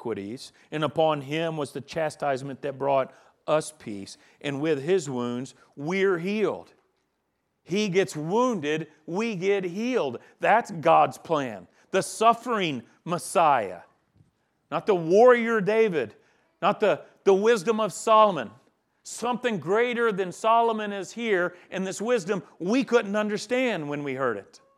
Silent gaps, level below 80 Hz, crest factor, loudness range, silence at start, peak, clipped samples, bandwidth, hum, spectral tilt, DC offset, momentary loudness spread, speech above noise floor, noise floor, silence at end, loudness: none; -76 dBFS; 20 dB; 5 LU; 0 s; -6 dBFS; under 0.1%; 14 kHz; none; -5 dB/octave; under 0.1%; 14 LU; 51 dB; -76 dBFS; 0.2 s; -25 LUFS